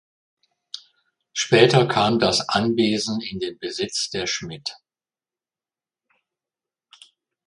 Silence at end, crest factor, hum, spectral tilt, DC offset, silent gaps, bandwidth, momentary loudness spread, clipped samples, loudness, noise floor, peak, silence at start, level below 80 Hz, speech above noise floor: 2.75 s; 24 dB; none; -4 dB/octave; under 0.1%; none; 11.5 kHz; 17 LU; under 0.1%; -21 LUFS; under -90 dBFS; 0 dBFS; 0.75 s; -58 dBFS; over 69 dB